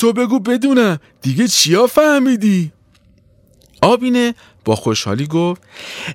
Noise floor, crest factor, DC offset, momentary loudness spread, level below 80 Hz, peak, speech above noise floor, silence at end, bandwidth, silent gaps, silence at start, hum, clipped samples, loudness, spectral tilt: -51 dBFS; 14 dB; under 0.1%; 11 LU; -54 dBFS; 0 dBFS; 37 dB; 0 s; 16.5 kHz; none; 0 s; none; under 0.1%; -15 LUFS; -4.5 dB/octave